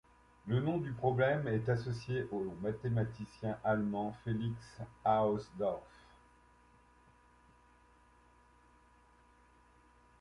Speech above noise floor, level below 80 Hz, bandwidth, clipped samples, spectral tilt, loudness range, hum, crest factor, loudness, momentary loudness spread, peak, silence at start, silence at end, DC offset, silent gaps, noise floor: 30 dB; -64 dBFS; 11 kHz; under 0.1%; -8.5 dB/octave; 5 LU; none; 20 dB; -36 LUFS; 9 LU; -18 dBFS; 0.45 s; 4.35 s; under 0.1%; none; -65 dBFS